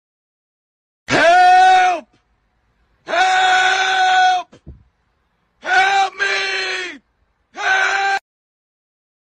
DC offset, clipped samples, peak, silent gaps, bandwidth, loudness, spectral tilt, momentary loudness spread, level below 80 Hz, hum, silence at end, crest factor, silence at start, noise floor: under 0.1%; under 0.1%; -4 dBFS; none; 10 kHz; -14 LUFS; -1.5 dB/octave; 13 LU; -54 dBFS; none; 1 s; 14 dB; 1.1 s; -65 dBFS